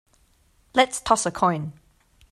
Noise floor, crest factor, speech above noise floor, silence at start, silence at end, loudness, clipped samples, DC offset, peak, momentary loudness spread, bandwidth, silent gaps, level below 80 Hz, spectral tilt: -61 dBFS; 22 dB; 39 dB; 0.75 s; 0.6 s; -22 LUFS; under 0.1%; under 0.1%; -4 dBFS; 10 LU; 14 kHz; none; -54 dBFS; -3.5 dB/octave